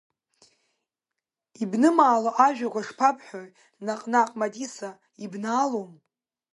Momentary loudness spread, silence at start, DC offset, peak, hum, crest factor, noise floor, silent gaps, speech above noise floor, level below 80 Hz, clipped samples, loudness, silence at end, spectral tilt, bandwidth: 19 LU; 1.6 s; under 0.1%; -4 dBFS; none; 22 dB; -87 dBFS; none; 63 dB; -80 dBFS; under 0.1%; -24 LUFS; 0.6 s; -5 dB/octave; 11.5 kHz